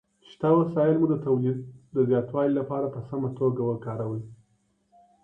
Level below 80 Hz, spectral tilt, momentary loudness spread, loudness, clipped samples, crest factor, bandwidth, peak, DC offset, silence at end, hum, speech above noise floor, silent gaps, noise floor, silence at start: -64 dBFS; -11 dB/octave; 10 LU; -26 LUFS; under 0.1%; 18 dB; 4.2 kHz; -10 dBFS; under 0.1%; 0.9 s; none; 44 dB; none; -69 dBFS; 0.4 s